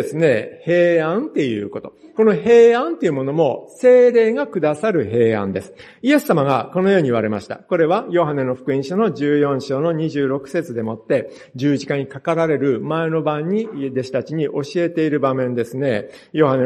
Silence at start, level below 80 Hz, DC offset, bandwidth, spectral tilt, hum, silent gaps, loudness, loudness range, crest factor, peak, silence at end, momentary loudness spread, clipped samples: 0 s; -62 dBFS; under 0.1%; 13 kHz; -7 dB/octave; none; none; -18 LUFS; 6 LU; 16 dB; -2 dBFS; 0 s; 10 LU; under 0.1%